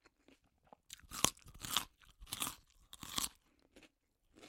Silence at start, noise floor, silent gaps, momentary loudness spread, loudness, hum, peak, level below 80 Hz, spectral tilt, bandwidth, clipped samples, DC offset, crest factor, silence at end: 0.9 s; -77 dBFS; none; 20 LU; -40 LUFS; none; -8 dBFS; -66 dBFS; -1 dB/octave; 16.5 kHz; under 0.1%; under 0.1%; 38 dB; 0 s